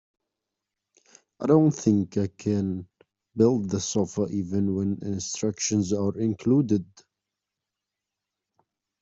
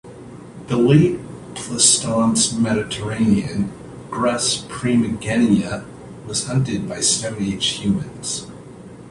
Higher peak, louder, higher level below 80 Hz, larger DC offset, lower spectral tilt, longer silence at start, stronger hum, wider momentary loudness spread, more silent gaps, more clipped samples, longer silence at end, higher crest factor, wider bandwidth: second, -6 dBFS vs 0 dBFS; second, -25 LUFS vs -19 LUFS; second, -64 dBFS vs -46 dBFS; neither; first, -6.5 dB/octave vs -4 dB/octave; first, 1.4 s vs 0.05 s; neither; second, 8 LU vs 22 LU; neither; neither; first, 2.2 s vs 0 s; about the same, 20 dB vs 20 dB; second, 8 kHz vs 11.5 kHz